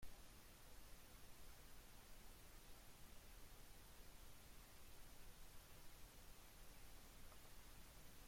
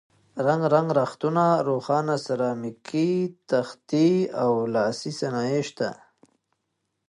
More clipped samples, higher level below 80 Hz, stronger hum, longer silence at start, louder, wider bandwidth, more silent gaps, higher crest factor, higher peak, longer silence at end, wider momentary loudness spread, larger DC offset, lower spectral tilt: neither; first, -66 dBFS vs -72 dBFS; neither; second, 0 s vs 0.35 s; second, -64 LUFS vs -24 LUFS; first, 16.5 kHz vs 11.5 kHz; neither; about the same, 16 dB vs 18 dB; second, -44 dBFS vs -6 dBFS; second, 0 s vs 1.15 s; second, 1 LU vs 9 LU; neither; second, -3 dB/octave vs -6.5 dB/octave